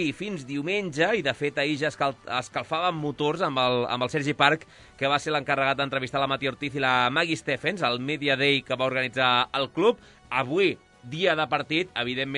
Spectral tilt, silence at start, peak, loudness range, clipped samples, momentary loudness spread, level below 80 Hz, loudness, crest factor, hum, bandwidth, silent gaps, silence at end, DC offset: -4.5 dB/octave; 0 s; -4 dBFS; 2 LU; under 0.1%; 7 LU; -62 dBFS; -25 LUFS; 22 dB; none; 11 kHz; none; 0 s; under 0.1%